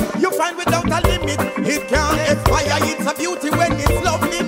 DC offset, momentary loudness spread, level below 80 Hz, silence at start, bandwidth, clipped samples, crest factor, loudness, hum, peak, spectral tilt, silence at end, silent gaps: under 0.1%; 4 LU; -28 dBFS; 0 s; 16.5 kHz; under 0.1%; 16 dB; -18 LUFS; none; -2 dBFS; -4.5 dB/octave; 0 s; none